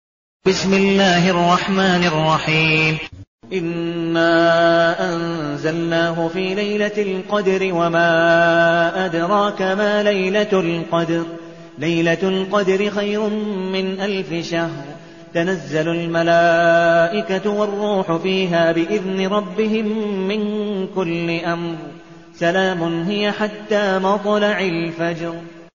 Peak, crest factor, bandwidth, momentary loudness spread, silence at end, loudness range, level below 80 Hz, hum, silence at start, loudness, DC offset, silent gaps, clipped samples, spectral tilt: -4 dBFS; 14 dB; 7.4 kHz; 9 LU; 0.1 s; 5 LU; -54 dBFS; none; 0.45 s; -18 LUFS; 0.3%; 3.27-3.39 s; under 0.1%; -4 dB/octave